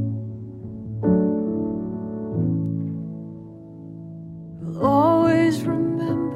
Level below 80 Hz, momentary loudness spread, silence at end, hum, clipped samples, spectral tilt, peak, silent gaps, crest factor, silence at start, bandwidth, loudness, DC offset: -52 dBFS; 21 LU; 0 s; none; under 0.1%; -8.5 dB/octave; -6 dBFS; none; 16 dB; 0 s; 13 kHz; -22 LUFS; under 0.1%